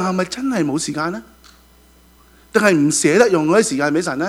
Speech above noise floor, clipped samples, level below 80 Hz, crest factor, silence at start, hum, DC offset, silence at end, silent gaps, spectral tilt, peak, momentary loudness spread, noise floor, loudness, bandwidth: 33 dB; under 0.1%; -52 dBFS; 18 dB; 0 s; none; under 0.1%; 0 s; none; -4.5 dB/octave; 0 dBFS; 9 LU; -50 dBFS; -17 LUFS; 15.5 kHz